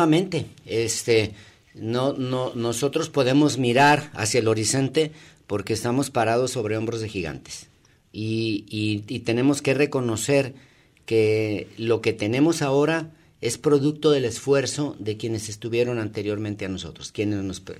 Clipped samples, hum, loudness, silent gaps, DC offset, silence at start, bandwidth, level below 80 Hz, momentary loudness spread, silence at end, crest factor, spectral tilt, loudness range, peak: under 0.1%; none; -23 LUFS; none; under 0.1%; 0 s; 15.5 kHz; -58 dBFS; 11 LU; 0 s; 18 dB; -5 dB/octave; 5 LU; -6 dBFS